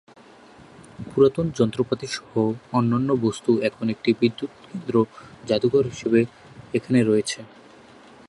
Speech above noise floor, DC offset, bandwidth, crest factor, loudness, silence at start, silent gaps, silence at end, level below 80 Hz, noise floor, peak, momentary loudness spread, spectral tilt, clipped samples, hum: 26 dB; under 0.1%; 11.5 kHz; 18 dB; -23 LUFS; 1 s; none; 0.85 s; -58 dBFS; -48 dBFS; -6 dBFS; 11 LU; -6.5 dB/octave; under 0.1%; none